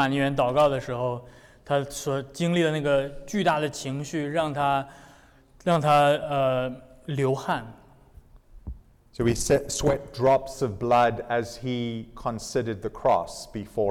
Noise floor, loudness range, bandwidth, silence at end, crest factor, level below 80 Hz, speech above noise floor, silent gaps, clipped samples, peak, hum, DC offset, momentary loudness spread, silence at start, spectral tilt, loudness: -54 dBFS; 3 LU; 17 kHz; 0 s; 14 dB; -48 dBFS; 29 dB; none; under 0.1%; -12 dBFS; none; under 0.1%; 12 LU; 0 s; -5.5 dB/octave; -25 LUFS